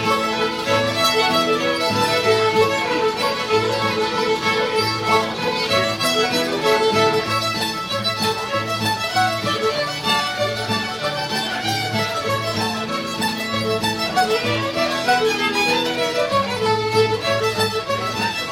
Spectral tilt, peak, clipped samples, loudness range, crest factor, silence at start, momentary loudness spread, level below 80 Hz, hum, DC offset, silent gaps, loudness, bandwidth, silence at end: -3.5 dB/octave; -4 dBFS; under 0.1%; 3 LU; 16 dB; 0 s; 5 LU; -52 dBFS; none; under 0.1%; none; -19 LUFS; 16.5 kHz; 0 s